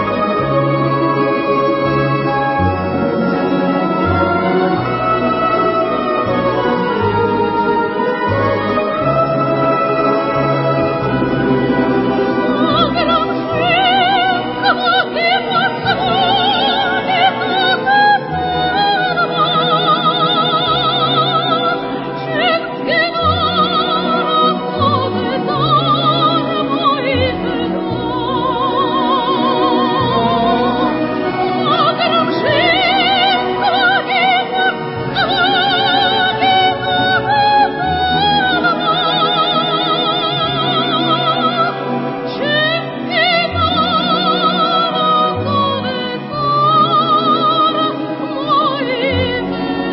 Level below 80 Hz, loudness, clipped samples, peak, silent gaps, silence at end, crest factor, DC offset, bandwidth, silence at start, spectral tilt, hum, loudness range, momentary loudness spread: -40 dBFS; -14 LUFS; under 0.1%; 0 dBFS; none; 0 s; 14 dB; under 0.1%; 5.8 kHz; 0 s; -10.5 dB/octave; none; 2 LU; 5 LU